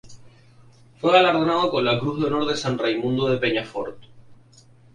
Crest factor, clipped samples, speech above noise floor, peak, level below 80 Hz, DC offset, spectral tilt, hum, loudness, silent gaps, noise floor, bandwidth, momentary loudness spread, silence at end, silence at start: 22 dB; under 0.1%; 31 dB; -2 dBFS; -58 dBFS; under 0.1%; -5.5 dB/octave; none; -21 LUFS; none; -52 dBFS; 10.5 kHz; 10 LU; 0.6 s; 0.05 s